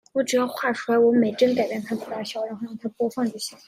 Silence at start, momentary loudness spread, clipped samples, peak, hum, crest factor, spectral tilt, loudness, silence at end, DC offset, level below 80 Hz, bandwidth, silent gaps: 0.15 s; 12 LU; under 0.1%; -6 dBFS; none; 16 dB; -4.5 dB/octave; -24 LUFS; 0.1 s; under 0.1%; -72 dBFS; 15.5 kHz; none